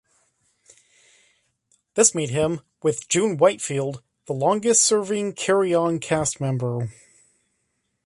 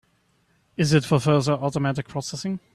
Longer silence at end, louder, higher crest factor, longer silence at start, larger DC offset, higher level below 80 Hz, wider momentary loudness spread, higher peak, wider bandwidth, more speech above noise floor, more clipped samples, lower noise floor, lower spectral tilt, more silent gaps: first, 1.15 s vs 0.15 s; about the same, -21 LUFS vs -23 LUFS; about the same, 22 dB vs 20 dB; first, 1.95 s vs 0.8 s; neither; about the same, -58 dBFS vs -56 dBFS; about the same, 12 LU vs 11 LU; about the same, -2 dBFS vs -4 dBFS; second, 11.5 kHz vs 13 kHz; first, 52 dB vs 43 dB; neither; first, -74 dBFS vs -65 dBFS; second, -4 dB/octave vs -6 dB/octave; neither